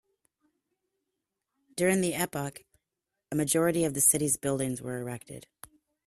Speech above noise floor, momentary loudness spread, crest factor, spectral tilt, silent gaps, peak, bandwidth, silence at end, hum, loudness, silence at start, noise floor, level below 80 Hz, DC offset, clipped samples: 58 dB; 18 LU; 22 dB; -4 dB/octave; none; -8 dBFS; 15.5 kHz; 0.65 s; none; -27 LUFS; 1.75 s; -86 dBFS; -64 dBFS; under 0.1%; under 0.1%